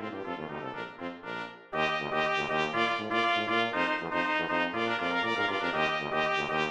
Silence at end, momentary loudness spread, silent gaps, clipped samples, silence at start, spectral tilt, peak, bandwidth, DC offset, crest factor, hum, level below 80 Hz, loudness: 0 s; 11 LU; none; under 0.1%; 0 s; -4.5 dB/octave; -12 dBFS; 11 kHz; under 0.1%; 18 dB; none; -64 dBFS; -30 LUFS